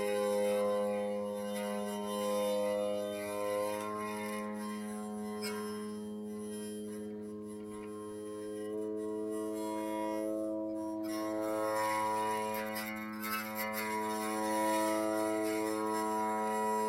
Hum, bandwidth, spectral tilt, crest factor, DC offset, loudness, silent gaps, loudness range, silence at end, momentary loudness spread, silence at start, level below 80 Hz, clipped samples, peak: none; 16 kHz; -4.5 dB/octave; 16 dB; under 0.1%; -36 LUFS; none; 7 LU; 0 s; 10 LU; 0 s; -76 dBFS; under 0.1%; -20 dBFS